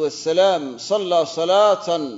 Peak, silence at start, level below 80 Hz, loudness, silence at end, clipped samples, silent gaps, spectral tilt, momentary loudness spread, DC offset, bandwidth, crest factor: -4 dBFS; 0 s; -74 dBFS; -18 LUFS; 0 s; under 0.1%; none; -3.5 dB/octave; 7 LU; under 0.1%; 8 kHz; 14 dB